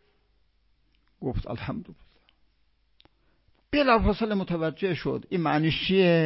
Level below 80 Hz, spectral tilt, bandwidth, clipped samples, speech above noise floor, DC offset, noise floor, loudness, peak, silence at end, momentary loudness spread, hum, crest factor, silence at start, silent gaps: -42 dBFS; -10.5 dB/octave; 5.8 kHz; under 0.1%; 43 dB; under 0.1%; -68 dBFS; -26 LUFS; -8 dBFS; 0 s; 13 LU; none; 20 dB; 1.2 s; none